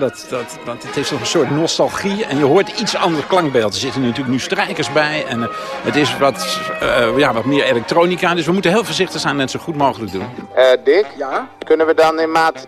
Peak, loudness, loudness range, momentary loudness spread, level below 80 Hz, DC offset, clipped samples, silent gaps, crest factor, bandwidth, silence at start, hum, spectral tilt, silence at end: 0 dBFS; -16 LUFS; 2 LU; 9 LU; -50 dBFS; under 0.1%; under 0.1%; none; 16 dB; 14.5 kHz; 0 s; none; -4.5 dB/octave; 0 s